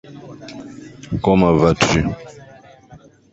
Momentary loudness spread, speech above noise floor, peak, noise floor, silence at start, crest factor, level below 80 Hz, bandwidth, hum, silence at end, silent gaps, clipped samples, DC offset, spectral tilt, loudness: 23 LU; 28 dB; 0 dBFS; -45 dBFS; 0.1 s; 18 dB; -38 dBFS; 8.2 kHz; none; 0.35 s; none; under 0.1%; under 0.1%; -6 dB/octave; -16 LUFS